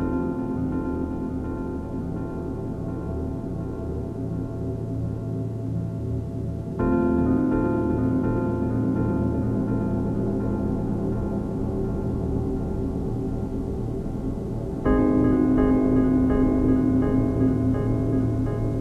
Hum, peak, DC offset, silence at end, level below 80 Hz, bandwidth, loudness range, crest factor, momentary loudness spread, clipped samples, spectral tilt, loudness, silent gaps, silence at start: none; -8 dBFS; under 0.1%; 0 s; -34 dBFS; 6.6 kHz; 9 LU; 16 dB; 10 LU; under 0.1%; -10.5 dB/octave; -25 LUFS; none; 0 s